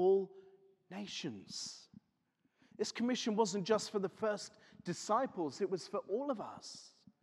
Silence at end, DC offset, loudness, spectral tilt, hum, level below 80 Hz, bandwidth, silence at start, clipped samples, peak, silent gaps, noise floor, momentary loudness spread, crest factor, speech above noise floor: 0.35 s; under 0.1%; -38 LUFS; -4.5 dB/octave; none; -84 dBFS; 12 kHz; 0 s; under 0.1%; -18 dBFS; none; -80 dBFS; 15 LU; 20 dB; 42 dB